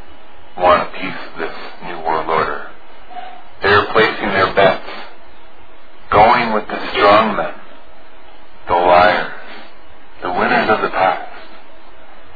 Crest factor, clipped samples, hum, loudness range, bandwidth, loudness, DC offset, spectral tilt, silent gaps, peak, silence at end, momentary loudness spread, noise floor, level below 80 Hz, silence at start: 18 dB; under 0.1%; none; 5 LU; 5 kHz; -15 LUFS; 5%; -7 dB/octave; none; 0 dBFS; 0.1 s; 22 LU; -43 dBFS; -42 dBFS; 0 s